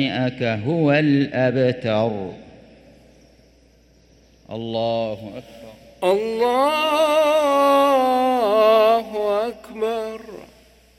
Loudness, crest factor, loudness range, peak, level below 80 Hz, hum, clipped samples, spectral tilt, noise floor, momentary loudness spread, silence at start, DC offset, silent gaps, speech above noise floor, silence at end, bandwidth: -19 LUFS; 16 dB; 13 LU; -4 dBFS; -56 dBFS; none; under 0.1%; -6 dB/octave; -54 dBFS; 16 LU; 0 s; under 0.1%; none; 35 dB; 0.55 s; 15 kHz